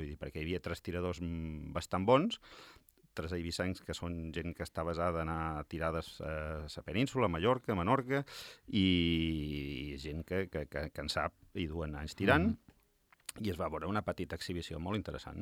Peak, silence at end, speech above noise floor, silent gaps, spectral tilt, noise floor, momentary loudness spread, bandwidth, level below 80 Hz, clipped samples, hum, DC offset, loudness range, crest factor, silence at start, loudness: -12 dBFS; 0 s; 34 dB; none; -6 dB/octave; -70 dBFS; 12 LU; 16.5 kHz; -54 dBFS; under 0.1%; none; under 0.1%; 5 LU; 24 dB; 0 s; -36 LUFS